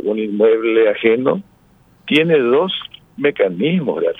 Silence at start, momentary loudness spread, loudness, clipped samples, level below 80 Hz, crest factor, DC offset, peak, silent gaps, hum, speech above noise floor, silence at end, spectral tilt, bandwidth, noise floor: 0 s; 10 LU; -16 LUFS; under 0.1%; -60 dBFS; 16 dB; under 0.1%; 0 dBFS; none; none; 36 dB; 0.05 s; -7.5 dB/octave; 4 kHz; -52 dBFS